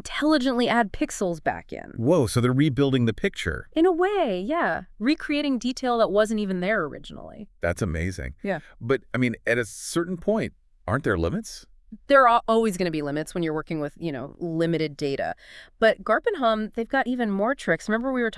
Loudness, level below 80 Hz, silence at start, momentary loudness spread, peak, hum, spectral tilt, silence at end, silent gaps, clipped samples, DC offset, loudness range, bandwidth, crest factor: -24 LUFS; -48 dBFS; 0.05 s; 11 LU; -4 dBFS; none; -5.5 dB/octave; 0 s; none; under 0.1%; under 0.1%; 4 LU; 12 kHz; 20 dB